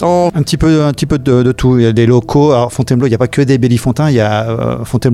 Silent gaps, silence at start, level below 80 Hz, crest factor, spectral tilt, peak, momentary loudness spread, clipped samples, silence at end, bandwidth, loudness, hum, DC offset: none; 0 s; -30 dBFS; 10 dB; -7 dB/octave; 0 dBFS; 5 LU; under 0.1%; 0 s; 14 kHz; -11 LUFS; none; under 0.1%